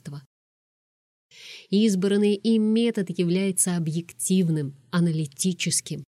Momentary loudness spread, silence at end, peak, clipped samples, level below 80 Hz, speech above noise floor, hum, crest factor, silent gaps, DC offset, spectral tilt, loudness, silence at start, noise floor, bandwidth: 8 LU; 0.1 s; -10 dBFS; under 0.1%; -72 dBFS; over 67 dB; none; 16 dB; 0.26-1.30 s; under 0.1%; -5 dB/octave; -24 LUFS; 0.05 s; under -90 dBFS; 15 kHz